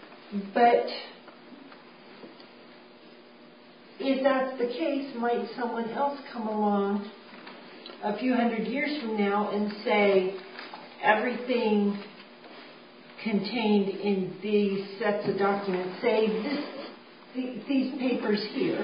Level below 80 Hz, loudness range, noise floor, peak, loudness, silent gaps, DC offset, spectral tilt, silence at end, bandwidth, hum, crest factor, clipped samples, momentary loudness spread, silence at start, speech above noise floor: -80 dBFS; 4 LU; -52 dBFS; -8 dBFS; -28 LUFS; none; under 0.1%; -10 dB/octave; 0 s; 5.2 kHz; none; 22 dB; under 0.1%; 22 LU; 0 s; 25 dB